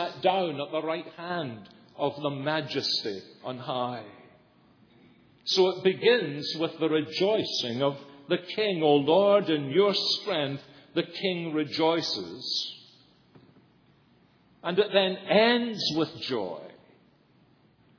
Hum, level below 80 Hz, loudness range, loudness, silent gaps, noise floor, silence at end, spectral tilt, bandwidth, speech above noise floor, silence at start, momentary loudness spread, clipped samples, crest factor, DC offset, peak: none; -78 dBFS; 7 LU; -27 LUFS; none; -62 dBFS; 1.25 s; -5 dB/octave; 5.4 kHz; 35 dB; 0 s; 13 LU; under 0.1%; 20 dB; under 0.1%; -8 dBFS